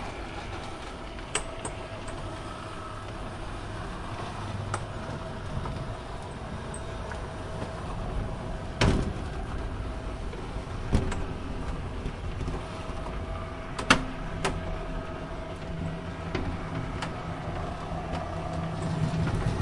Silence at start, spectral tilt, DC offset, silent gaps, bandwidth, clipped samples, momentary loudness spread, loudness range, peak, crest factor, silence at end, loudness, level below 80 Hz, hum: 0 s; -5 dB/octave; under 0.1%; none; 11.5 kHz; under 0.1%; 9 LU; 6 LU; -2 dBFS; 30 dB; 0 s; -34 LUFS; -38 dBFS; none